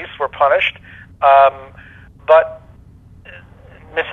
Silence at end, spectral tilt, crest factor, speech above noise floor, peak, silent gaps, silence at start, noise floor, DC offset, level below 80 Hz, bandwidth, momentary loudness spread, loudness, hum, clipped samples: 0 s; -5 dB/octave; 18 dB; 29 dB; 0 dBFS; none; 0 s; -43 dBFS; under 0.1%; -48 dBFS; 4.2 kHz; 16 LU; -14 LUFS; none; under 0.1%